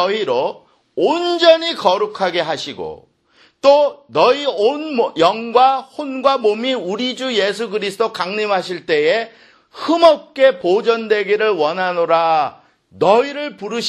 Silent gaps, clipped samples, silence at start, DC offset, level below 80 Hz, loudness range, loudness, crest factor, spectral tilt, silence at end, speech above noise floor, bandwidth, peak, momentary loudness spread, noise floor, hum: none; under 0.1%; 0 s; under 0.1%; -64 dBFS; 3 LU; -16 LUFS; 16 dB; -4 dB/octave; 0 s; 38 dB; 12.5 kHz; 0 dBFS; 10 LU; -54 dBFS; none